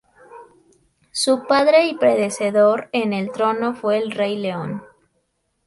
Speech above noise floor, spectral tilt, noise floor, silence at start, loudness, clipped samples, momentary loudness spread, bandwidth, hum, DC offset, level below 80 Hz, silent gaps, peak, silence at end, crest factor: 51 dB; -4.5 dB/octave; -69 dBFS; 0.3 s; -19 LUFS; under 0.1%; 11 LU; 11.5 kHz; none; under 0.1%; -66 dBFS; none; -2 dBFS; 0.8 s; 18 dB